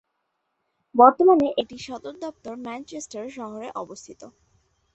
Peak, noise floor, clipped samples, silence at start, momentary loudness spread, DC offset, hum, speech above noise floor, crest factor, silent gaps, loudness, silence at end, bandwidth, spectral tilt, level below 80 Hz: -2 dBFS; -76 dBFS; under 0.1%; 0.95 s; 20 LU; under 0.1%; none; 54 dB; 22 dB; none; -18 LUFS; 0.65 s; 8.2 kHz; -4.5 dB/octave; -64 dBFS